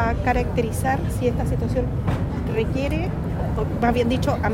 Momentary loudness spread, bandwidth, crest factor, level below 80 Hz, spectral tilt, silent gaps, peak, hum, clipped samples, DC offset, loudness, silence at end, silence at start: 4 LU; 16 kHz; 14 dB; -30 dBFS; -7 dB/octave; none; -6 dBFS; none; under 0.1%; under 0.1%; -23 LUFS; 0 s; 0 s